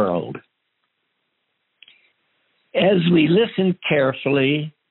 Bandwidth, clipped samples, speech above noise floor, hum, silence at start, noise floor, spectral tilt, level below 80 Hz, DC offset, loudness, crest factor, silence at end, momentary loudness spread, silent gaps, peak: 4.2 kHz; under 0.1%; 55 dB; none; 0 s; -73 dBFS; -5 dB/octave; -64 dBFS; under 0.1%; -19 LUFS; 16 dB; 0.2 s; 11 LU; none; -4 dBFS